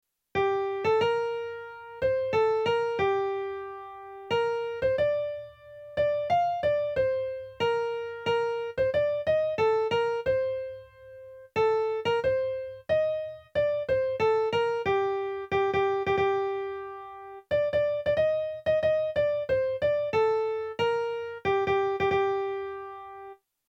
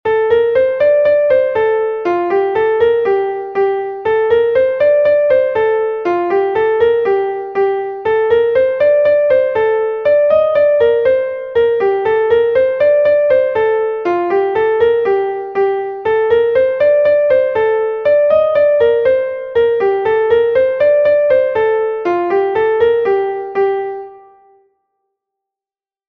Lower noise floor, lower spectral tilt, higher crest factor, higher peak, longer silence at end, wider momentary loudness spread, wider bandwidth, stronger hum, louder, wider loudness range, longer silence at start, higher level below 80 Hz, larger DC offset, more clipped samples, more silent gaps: second, -48 dBFS vs under -90 dBFS; about the same, -6 dB/octave vs -7 dB/octave; about the same, 14 dB vs 12 dB; second, -14 dBFS vs -2 dBFS; second, 0.35 s vs 1.9 s; first, 14 LU vs 6 LU; first, 7.8 kHz vs 5.2 kHz; neither; second, -28 LUFS vs -13 LUFS; about the same, 2 LU vs 2 LU; first, 0.35 s vs 0.05 s; second, -58 dBFS vs -50 dBFS; neither; neither; neither